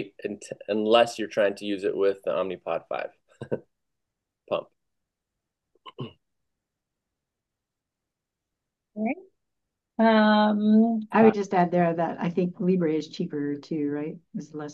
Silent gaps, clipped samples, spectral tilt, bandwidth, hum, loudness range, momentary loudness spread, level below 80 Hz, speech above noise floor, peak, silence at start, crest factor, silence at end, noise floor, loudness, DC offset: none; under 0.1%; -6.5 dB/octave; 9.8 kHz; none; 18 LU; 18 LU; -76 dBFS; 61 dB; -6 dBFS; 0 s; 22 dB; 0 s; -86 dBFS; -25 LUFS; under 0.1%